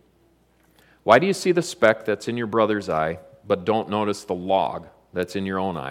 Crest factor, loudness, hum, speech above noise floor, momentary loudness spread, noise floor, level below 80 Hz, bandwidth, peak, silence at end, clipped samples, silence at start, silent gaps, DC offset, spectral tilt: 22 dB; -22 LUFS; none; 39 dB; 11 LU; -60 dBFS; -60 dBFS; 16 kHz; -2 dBFS; 0 s; under 0.1%; 1.05 s; none; under 0.1%; -5 dB/octave